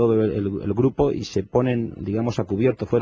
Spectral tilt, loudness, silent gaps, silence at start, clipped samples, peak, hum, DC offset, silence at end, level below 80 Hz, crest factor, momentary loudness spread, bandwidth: -8 dB/octave; -23 LUFS; none; 0 s; under 0.1%; -4 dBFS; none; under 0.1%; 0 s; -44 dBFS; 16 dB; 6 LU; 7.6 kHz